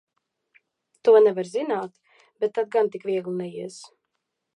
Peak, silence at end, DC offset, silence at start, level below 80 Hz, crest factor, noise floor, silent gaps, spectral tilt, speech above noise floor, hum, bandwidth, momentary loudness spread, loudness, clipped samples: -6 dBFS; 0.7 s; under 0.1%; 1.05 s; -82 dBFS; 20 dB; -80 dBFS; none; -6 dB/octave; 58 dB; none; 10.5 kHz; 20 LU; -23 LUFS; under 0.1%